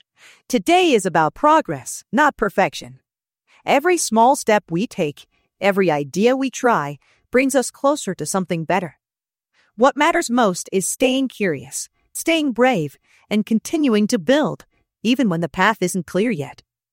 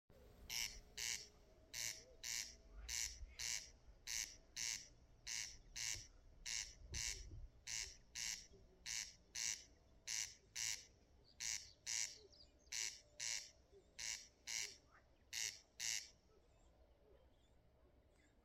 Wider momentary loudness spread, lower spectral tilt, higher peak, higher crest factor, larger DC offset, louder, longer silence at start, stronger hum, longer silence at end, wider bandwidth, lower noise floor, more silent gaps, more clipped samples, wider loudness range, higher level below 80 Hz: second, 10 LU vs 15 LU; first, -4.5 dB/octave vs 1 dB/octave; first, -2 dBFS vs -28 dBFS; about the same, 18 dB vs 22 dB; neither; first, -19 LUFS vs -47 LUFS; first, 0.5 s vs 0.1 s; neither; first, 0.45 s vs 0.05 s; about the same, 16.5 kHz vs 16 kHz; first, under -90 dBFS vs -73 dBFS; neither; neither; about the same, 2 LU vs 2 LU; first, -56 dBFS vs -66 dBFS